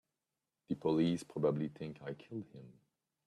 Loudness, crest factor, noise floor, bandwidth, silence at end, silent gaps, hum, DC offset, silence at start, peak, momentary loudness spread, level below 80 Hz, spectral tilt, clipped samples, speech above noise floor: -38 LUFS; 18 dB; under -90 dBFS; 12 kHz; 0.55 s; none; none; under 0.1%; 0.7 s; -20 dBFS; 15 LU; -74 dBFS; -7.5 dB/octave; under 0.1%; over 53 dB